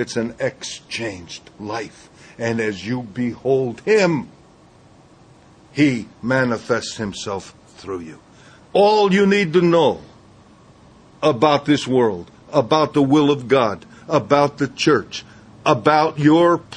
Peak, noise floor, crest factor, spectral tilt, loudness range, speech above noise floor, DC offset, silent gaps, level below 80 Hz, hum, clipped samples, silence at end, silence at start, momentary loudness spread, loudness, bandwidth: 0 dBFS; -49 dBFS; 20 dB; -5.5 dB/octave; 6 LU; 31 dB; under 0.1%; none; -56 dBFS; none; under 0.1%; 0 s; 0 s; 16 LU; -18 LUFS; 9.8 kHz